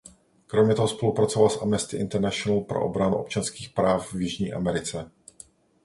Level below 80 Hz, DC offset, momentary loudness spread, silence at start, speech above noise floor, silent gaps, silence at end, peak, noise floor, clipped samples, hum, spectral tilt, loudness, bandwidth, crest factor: -52 dBFS; under 0.1%; 8 LU; 0.5 s; 28 dB; none; 0.75 s; -6 dBFS; -52 dBFS; under 0.1%; none; -5.5 dB/octave; -25 LUFS; 11.5 kHz; 20 dB